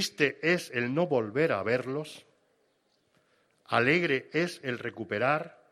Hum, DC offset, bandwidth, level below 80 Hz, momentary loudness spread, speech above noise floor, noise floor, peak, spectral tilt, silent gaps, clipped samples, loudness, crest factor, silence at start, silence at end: none; under 0.1%; 14.5 kHz; -72 dBFS; 10 LU; 43 dB; -72 dBFS; -8 dBFS; -5 dB/octave; none; under 0.1%; -29 LUFS; 22 dB; 0 s; 0.2 s